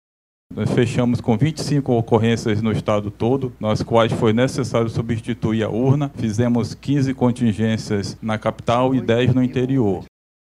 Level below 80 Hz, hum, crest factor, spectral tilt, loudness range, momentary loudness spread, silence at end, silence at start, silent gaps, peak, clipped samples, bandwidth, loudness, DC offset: -48 dBFS; none; 18 dB; -7 dB/octave; 1 LU; 6 LU; 0.5 s; 0.5 s; none; -2 dBFS; under 0.1%; 12 kHz; -20 LUFS; under 0.1%